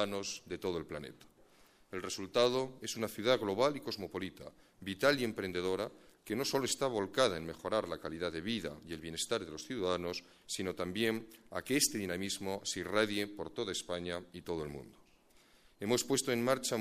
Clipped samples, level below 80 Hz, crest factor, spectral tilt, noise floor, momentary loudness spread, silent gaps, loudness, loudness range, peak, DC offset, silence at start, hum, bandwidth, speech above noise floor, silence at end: under 0.1%; -66 dBFS; 24 dB; -3.5 dB/octave; -66 dBFS; 13 LU; none; -36 LUFS; 4 LU; -14 dBFS; under 0.1%; 0 s; none; 15.5 kHz; 30 dB; 0 s